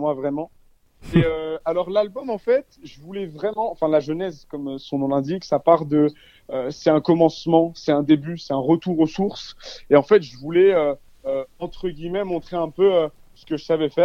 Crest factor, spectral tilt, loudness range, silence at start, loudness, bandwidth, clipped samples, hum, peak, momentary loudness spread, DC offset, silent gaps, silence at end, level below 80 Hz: 20 dB; -7.5 dB/octave; 5 LU; 0 s; -21 LUFS; 7.2 kHz; under 0.1%; none; 0 dBFS; 13 LU; under 0.1%; none; 0 s; -50 dBFS